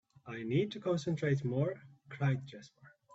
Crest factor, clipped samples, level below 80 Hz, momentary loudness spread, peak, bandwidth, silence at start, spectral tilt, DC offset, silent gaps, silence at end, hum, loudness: 16 dB; under 0.1%; -72 dBFS; 17 LU; -20 dBFS; 8 kHz; 0.25 s; -7.5 dB/octave; under 0.1%; none; 0.25 s; none; -35 LUFS